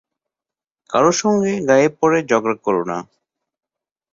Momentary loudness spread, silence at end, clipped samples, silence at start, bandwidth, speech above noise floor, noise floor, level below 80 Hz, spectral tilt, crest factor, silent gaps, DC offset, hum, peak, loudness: 7 LU; 1.1 s; under 0.1%; 0.9 s; 7.8 kHz; 72 dB; -89 dBFS; -60 dBFS; -5 dB/octave; 18 dB; none; under 0.1%; none; -2 dBFS; -17 LUFS